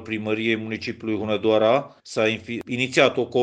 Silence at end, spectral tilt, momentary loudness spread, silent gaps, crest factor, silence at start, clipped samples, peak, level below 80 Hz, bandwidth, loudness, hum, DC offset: 0 s; -5 dB/octave; 10 LU; none; 20 dB; 0 s; under 0.1%; -4 dBFS; -62 dBFS; 9.6 kHz; -23 LUFS; none; under 0.1%